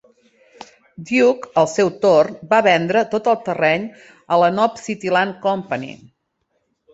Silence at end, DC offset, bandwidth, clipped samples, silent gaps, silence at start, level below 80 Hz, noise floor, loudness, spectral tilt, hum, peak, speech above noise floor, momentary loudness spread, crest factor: 1 s; under 0.1%; 8 kHz; under 0.1%; none; 1 s; -62 dBFS; -70 dBFS; -17 LUFS; -5 dB/octave; none; -2 dBFS; 53 dB; 11 LU; 18 dB